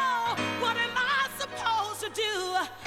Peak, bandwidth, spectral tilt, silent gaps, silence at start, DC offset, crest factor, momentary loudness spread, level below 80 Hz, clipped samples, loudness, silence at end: -14 dBFS; 19 kHz; -2 dB/octave; none; 0 s; under 0.1%; 14 dB; 5 LU; -64 dBFS; under 0.1%; -28 LUFS; 0 s